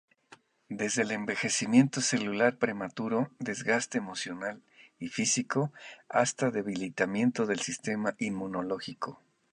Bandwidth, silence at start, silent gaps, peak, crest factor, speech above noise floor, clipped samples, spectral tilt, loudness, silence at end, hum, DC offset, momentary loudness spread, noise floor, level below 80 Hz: 11 kHz; 0.3 s; none; -8 dBFS; 22 dB; 29 dB; under 0.1%; -4 dB/octave; -30 LUFS; 0.4 s; none; under 0.1%; 11 LU; -59 dBFS; -72 dBFS